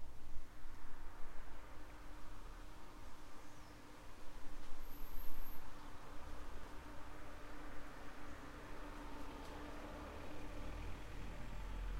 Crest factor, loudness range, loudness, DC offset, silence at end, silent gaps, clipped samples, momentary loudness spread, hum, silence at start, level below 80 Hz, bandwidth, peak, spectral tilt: 16 dB; 6 LU; -55 LUFS; under 0.1%; 0 s; none; under 0.1%; 7 LU; none; 0 s; -50 dBFS; 14 kHz; -24 dBFS; -5 dB/octave